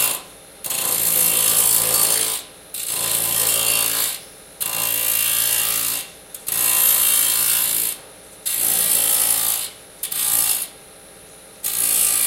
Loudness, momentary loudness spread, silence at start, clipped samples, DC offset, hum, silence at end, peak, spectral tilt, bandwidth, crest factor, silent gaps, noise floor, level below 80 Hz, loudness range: -17 LUFS; 14 LU; 0 s; under 0.1%; under 0.1%; none; 0 s; -2 dBFS; 1 dB/octave; 17.5 kHz; 18 dB; none; -43 dBFS; -56 dBFS; 3 LU